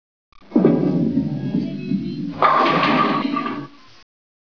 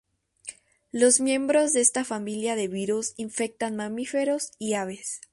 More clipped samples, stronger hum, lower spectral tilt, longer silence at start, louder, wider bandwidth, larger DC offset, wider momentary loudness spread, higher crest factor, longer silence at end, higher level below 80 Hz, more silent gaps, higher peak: neither; neither; first, -8 dB/octave vs -3 dB/octave; about the same, 0.5 s vs 0.45 s; first, -19 LUFS vs -25 LUFS; second, 5.4 kHz vs 11.5 kHz; first, 0.4% vs under 0.1%; second, 11 LU vs 15 LU; about the same, 18 dB vs 22 dB; first, 0.9 s vs 0.15 s; first, -58 dBFS vs -70 dBFS; neither; first, -2 dBFS vs -6 dBFS